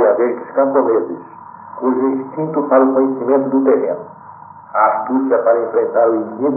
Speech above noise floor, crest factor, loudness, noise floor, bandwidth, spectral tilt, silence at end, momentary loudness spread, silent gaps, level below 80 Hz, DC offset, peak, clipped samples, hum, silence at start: 22 dB; 14 dB; -15 LUFS; -37 dBFS; 2.6 kHz; -13.5 dB/octave; 0 s; 13 LU; none; -72 dBFS; under 0.1%; 0 dBFS; under 0.1%; none; 0 s